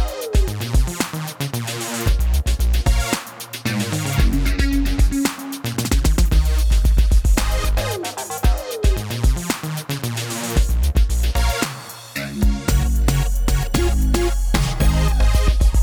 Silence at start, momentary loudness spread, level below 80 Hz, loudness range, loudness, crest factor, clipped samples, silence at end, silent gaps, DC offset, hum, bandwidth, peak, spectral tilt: 0 s; 7 LU; -18 dBFS; 3 LU; -20 LUFS; 16 dB; under 0.1%; 0 s; none; under 0.1%; none; over 20 kHz; -2 dBFS; -5 dB/octave